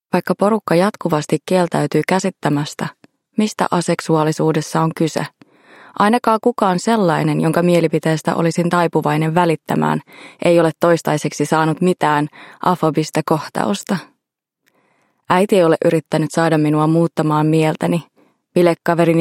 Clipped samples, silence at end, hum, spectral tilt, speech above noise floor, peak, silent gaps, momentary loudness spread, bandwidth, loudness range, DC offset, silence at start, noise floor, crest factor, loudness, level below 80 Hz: under 0.1%; 0 s; none; -6 dB/octave; 61 dB; 0 dBFS; none; 6 LU; 16.5 kHz; 3 LU; under 0.1%; 0.15 s; -77 dBFS; 16 dB; -17 LUFS; -62 dBFS